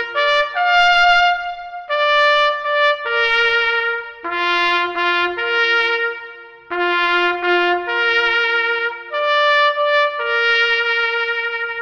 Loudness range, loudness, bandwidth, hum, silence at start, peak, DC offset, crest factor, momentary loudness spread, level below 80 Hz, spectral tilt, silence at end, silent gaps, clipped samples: 3 LU; -16 LUFS; 9 kHz; none; 0 s; -4 dBFS; under 0.1%; 12 dB; 9 LU; -52 dBFS; -2 dB/octave; 0 s; none; under 0.1%